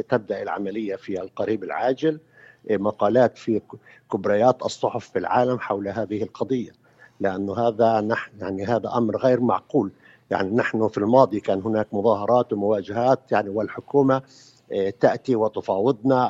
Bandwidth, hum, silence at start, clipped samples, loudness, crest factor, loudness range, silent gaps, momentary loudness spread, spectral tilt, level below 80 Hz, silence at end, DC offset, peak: 8 kHz; none; 0 s; under 0.1%; -23 LUFS; 22 dB; 3 LU; none; 9 LU; -7 dB/octave; -64 dBFS; 0 s; under 0.1%; -2 dBFS